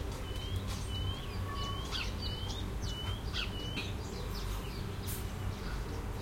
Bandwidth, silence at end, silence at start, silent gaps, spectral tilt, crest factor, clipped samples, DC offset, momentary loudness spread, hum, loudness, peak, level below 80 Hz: 16.5 kHz; 0 s; 0 s; none; -4.5 dB/octave; 14 dB; under 0.1%; under 0.1%; 3 LU; none; -39 LUFS; -22 dBFS; -42 dBFS